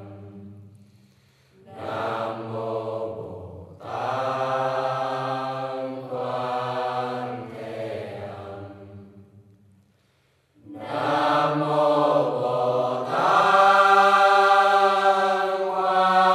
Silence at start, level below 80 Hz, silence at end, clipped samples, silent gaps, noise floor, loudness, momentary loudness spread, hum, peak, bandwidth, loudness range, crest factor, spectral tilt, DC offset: 0 s; -72 dBFS; 0 s; under 0.1%; none; -65 dBFS; -22 LUFS; 20 LU; none; -4 dBFS; 12.5 kHz; 15 LU; 18 dB; -5 dB/octave; under 0.1%